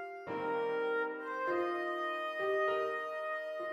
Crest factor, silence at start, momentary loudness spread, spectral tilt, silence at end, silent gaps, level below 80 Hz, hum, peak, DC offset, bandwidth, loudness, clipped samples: 12 dB; 0 s; 6 LU; -5 dB/octave; 0 s; none; -82 dBFS; none; -24 dBFS; under 0.1%; 15 kHz; -36 LUFS; under 0.1%